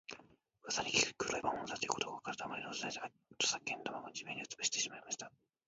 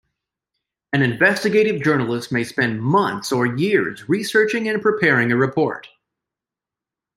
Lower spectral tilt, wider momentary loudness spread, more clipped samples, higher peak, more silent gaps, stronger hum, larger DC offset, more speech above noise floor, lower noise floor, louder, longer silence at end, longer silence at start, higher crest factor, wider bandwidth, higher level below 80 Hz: second, -0.5 dB/octave vs -6 dB/octave; first, 13 LU vs 7 LU; neither; second, -16 dBFS vs -2 dBFS; neither; neither; neither; second, 24 dB vs 69 dB; second, -65 dBFS vs -88 dBFS; second, -38 LUFS vs -19 LUFS; second, 0.4 s vs 1.3 s; second, 0.1 s vs 0.95 s; first, 26 dB vs 18 dB; second, 7.6 kHz vs 16 kHz; second, -74 dBFS vs -60 dBFS